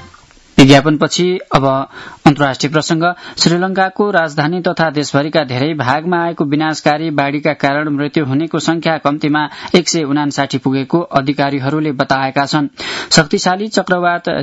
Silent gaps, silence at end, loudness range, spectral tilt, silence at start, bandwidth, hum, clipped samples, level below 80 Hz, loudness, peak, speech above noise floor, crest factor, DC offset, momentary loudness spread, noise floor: none; 0 s; 3 LU; -5 dB/octave; 0 s; 12 kHz; none; 0.3%; -44 dBFS; -14 LUFS; 0 dBFS; 29 dB; 14 dB; under 0.1%; 5 LU; -43 dBFS